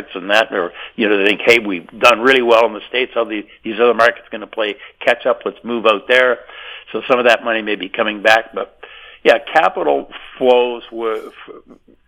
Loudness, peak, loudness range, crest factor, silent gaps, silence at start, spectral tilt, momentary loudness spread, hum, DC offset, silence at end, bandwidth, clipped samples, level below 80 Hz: -15 LUFS; 0 dBFS; 3 LU; 16 dB; none; 0 s; -3.5 dB/octave; 14 LU; none; under 0.1%; 0.5 s; 19 kHz; 0.2%; -56 dBFS